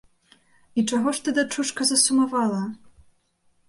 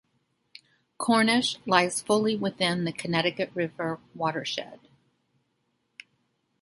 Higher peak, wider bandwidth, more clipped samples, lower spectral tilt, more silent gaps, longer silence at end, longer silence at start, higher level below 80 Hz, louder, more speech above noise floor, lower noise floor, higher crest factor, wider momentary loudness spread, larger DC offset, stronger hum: about the same, -6 dBFS vs -6 dBFS; about the same, 11.5 kHz vs 11.5 kHz; neither; second, -2.5 dB/octave vs -4 dB/octave; neither; second, 0.95 s vs 1.85 s; second, 0.75 s vs 1 s; about the same, -66 dBFS vs -70 dBFS; first, -22 LUFS vs -26 LUFS; second, 44 dB vs 48 dB; second, -67 dBFS vs -75 dBFS; about the same, 20 dB vs 22 dB; about the same, 11 LU vs 10 LU; neither; neither